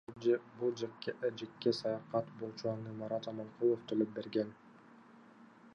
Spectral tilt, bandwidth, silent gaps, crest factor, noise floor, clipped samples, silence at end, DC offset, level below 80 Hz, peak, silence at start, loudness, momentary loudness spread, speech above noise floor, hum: -6.5 dB/octave; 9.2 kHz; none; 20 dB; -59 dBFS; under 0.1%; 0.05 s; under 0.1%; -80 dBFS; -18 dBFS; 0.1 s; -38 LUFS; 7 LU; 23 dB; none